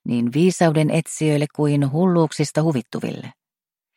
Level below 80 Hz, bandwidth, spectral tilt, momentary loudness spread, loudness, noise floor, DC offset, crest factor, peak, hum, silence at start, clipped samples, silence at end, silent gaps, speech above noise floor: -64 dBFS; 13.5 kHz; -6.5 dB/octave; 11 LU; -20 LUFS; under -90 dBFS; under 0.1%; 18 dB; -2 dBFS; none; 0.05 s; under 0.1%; 0.65 s; none; over 71 dB